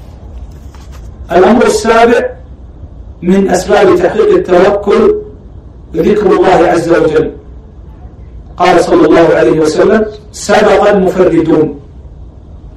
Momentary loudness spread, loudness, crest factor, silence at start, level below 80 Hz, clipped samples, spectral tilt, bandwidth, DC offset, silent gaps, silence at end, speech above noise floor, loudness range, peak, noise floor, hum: 12 LU; -8 LUFS; 10 dB; 0 s; -30 dBFS; 1%; -6 dB/octave; 13.5 kHz; under 0.1%; none; 0.05 s; 23 dB; 3 LU; 0 dBFS; -30 dBFS; none